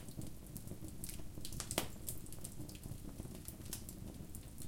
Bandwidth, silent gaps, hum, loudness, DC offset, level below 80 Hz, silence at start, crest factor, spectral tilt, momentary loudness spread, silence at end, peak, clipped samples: 17 kHz; none; none; -47 LUFS; under 0.1%; -56 dBFS; 0 s; 30 dB; -3.5 dB/octave; 10 LU; 0 s; -16 dBFS; under 0.1%